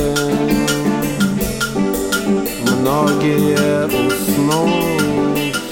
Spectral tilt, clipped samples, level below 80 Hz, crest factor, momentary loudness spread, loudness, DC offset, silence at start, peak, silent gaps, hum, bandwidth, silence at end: -5 dB/octave; under 0.1%; -38 dBFS; 14 dB; 4 LU; -16 LUFS; under 0.1%; 0 s; -2 dBFS; none; none; 17 kHz; 0 s